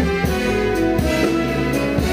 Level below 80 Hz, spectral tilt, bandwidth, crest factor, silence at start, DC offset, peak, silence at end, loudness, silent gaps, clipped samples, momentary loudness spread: -28 dBFS; -6 dB/octave; 16 kHz; 12 dB; 0 s; under 0.1%; -6 dBFS; 0 s; -19 LUFS; none; under 0.1%; 2 LU